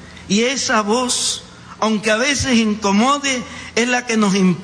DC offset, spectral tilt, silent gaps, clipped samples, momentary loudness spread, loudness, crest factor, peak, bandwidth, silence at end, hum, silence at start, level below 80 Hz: under 0.1%; -3.5 dB/octave; none; under 0.1%; 5 LU; -17 LUFS; 12 dB; -4 dBFS; 10.5 kHz; 0 s; none; 0 s; -46 dBFS